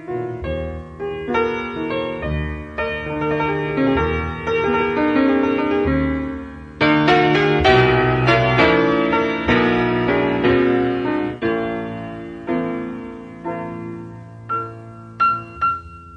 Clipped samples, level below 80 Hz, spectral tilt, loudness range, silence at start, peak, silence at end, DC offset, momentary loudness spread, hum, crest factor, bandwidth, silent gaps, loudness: under 0.1%; -36 dBFS; -7 dB/octave; 10 LU; 0 s; -2 dBFS; 0 s; under 0.1%; 16 LU; none; 18 dB; 8.4 kHz; none; -19 LUFS